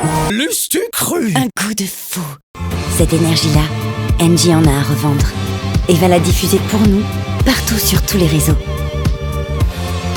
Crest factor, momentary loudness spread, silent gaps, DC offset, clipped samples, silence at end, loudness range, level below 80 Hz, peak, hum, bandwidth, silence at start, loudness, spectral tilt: 14 dB; 9 LU; 2.43-2.54 s; under 0.1%; under 0.1%; 0 s; 3 LU; -24 dBFS; 0 dBFS; none; over 20 kHz; 0 s; -14 LUFS; -5 dB/octave